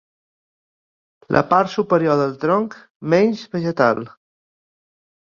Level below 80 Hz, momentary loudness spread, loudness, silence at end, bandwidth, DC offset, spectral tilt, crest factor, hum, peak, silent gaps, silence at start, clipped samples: -58 dBFS; 10 LU; -18 LUFS; 1.15 s; 7.2 kHz; under 0.1%; -7 dB/octave; 20 dB; none; -2 dBFS; 2.90-3.00 s; 1.3 s; under 0.1%